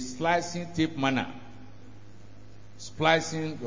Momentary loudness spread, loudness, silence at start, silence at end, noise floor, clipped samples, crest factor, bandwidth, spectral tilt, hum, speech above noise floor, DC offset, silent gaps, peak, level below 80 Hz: 20 LU; -28 LUFS; 0 s; 0 s; -51 dBFS; under 0.1%; 22 dB; 7.6 kHz; -4.5 dB/octave; none; 23 dB; 0.7%; none; -8 dBFS; -58 dBFS